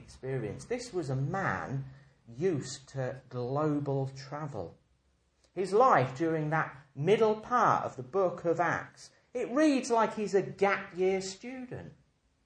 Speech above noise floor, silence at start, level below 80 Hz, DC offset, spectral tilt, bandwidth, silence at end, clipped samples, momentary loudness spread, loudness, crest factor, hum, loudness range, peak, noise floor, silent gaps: 41 dB; 0 s; -66 dBFS; under 0.1%; -6 dB/octave; 10 kHz; 0.55 s; under 0.1%; 14 LU; -31 LUFS; 22 dB; none; 7 LU; -10 dBFS; -72 dBFS; none